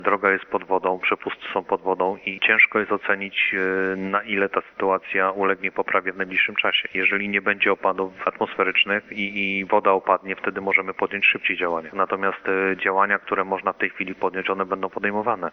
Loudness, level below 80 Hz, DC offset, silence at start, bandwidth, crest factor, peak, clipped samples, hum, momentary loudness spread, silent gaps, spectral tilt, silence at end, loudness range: -22 LUFS; -66 dBFS; under 0.1%; 0 s; 6.2 kHz; 20 dB; -2 dBFS; under 0.1%; none; 7 LU; none; -6.5 dB/octave; 0 s; 2 LU